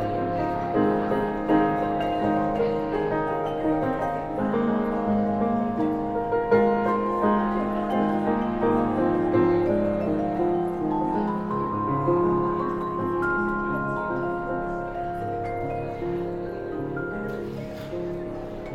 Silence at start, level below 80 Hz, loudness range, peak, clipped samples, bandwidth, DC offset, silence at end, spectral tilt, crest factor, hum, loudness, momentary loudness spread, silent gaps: 0 s; -46 dBFS; 6 LU; -8 dBFS; under 0.1%; 7.6 kHz; under 0.1%; 0 s; -9 dB/octave; 16 dB; none; -25 LUFS; 8 LU; none